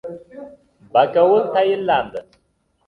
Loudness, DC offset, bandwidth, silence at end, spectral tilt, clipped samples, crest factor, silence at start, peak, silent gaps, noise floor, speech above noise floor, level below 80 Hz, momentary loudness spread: -17 LUFS; under 0.1%; 5.6 kHz; 0.65 s; -7 dB/octave; under 0.1%; 18 dB; 0.05 s; -2 dBFS; none; -65 dBFS; 49 dB; -60 dBFS; 22 LU